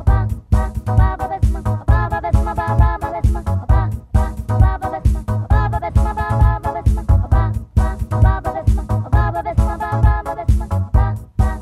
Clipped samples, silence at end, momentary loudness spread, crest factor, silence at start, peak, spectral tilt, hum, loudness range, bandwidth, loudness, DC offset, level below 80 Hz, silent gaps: under 0.1%; 0 s; 4 LU; 14 dB; 0 s; 0 dBFS; -8.5 dB/octave; none; 1 LU; 12 kHz; -18 LUFS; under 0.1%; -18 dBFS; none